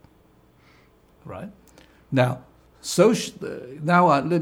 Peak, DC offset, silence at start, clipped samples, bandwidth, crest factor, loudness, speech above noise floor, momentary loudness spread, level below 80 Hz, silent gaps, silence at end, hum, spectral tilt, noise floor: -4 dBFS; under 0.1%; 1.25 s; under 0.1%; 16.5 kHz; 20 dB; -21 LUFS; 35 dB; 21 LU; -60 dBFS; none; 0 s; none; -5.5 dB/octave; -57 dBFS